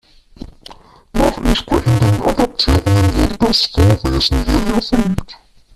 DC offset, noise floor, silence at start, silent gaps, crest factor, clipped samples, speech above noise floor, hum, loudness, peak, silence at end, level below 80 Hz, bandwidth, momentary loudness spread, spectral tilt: under 0.1%; -40 dBFS; 0.4 s; none; 14 dB; under 0.1%; 26 dB; none; -15 LUFS; -2 dBFS; 0.4 s; -24 dBFS; 14.5 kHz; 6 LU; -6 dB/octave